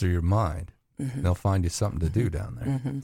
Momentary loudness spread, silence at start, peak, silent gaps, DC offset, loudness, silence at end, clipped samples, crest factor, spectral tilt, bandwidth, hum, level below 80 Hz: 10 LU; 0 s; -10 dBFS; none; under 0.1%; -27 LUFS; 0 s; under 0.1%; 16 dB; -7 dB/octave; 15 kHz; none; -38 dBFS